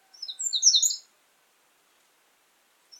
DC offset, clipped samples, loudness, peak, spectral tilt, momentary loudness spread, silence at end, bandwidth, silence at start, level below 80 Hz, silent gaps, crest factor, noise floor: under 0.1%; under 0.1%; -21 LUFS; -6 dBFS; 7.5 dB/octave; 17 LU; 2 s; 17.5 kHz; 0.2 s; under -90 dBFS; none; 24 dB; -66 dBFS